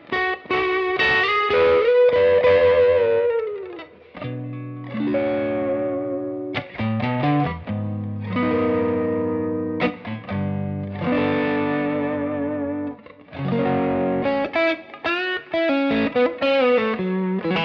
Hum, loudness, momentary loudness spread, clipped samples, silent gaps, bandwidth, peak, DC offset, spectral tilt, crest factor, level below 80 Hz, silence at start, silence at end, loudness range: none; -21 LUFS; 14 LU; under 0.1%; none; 6.2 kHz; -8 dBFS; under 0.1%; -8 dB/octave; 14 dB; -52 dBFS; 0.1 s; 0 s; 7 LU